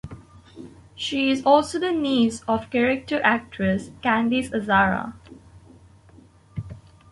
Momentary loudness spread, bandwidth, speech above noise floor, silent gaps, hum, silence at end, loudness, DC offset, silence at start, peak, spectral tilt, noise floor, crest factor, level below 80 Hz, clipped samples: 21 LU; 11.5 kHz; 30 dB; none; none; 0.35 s; -22 LUFS; under 0.1%; 0.05 s; -4 dBFS; -5 dB/octave; -51 dBFS; 20 dB; -50 dBFS; under 0.1%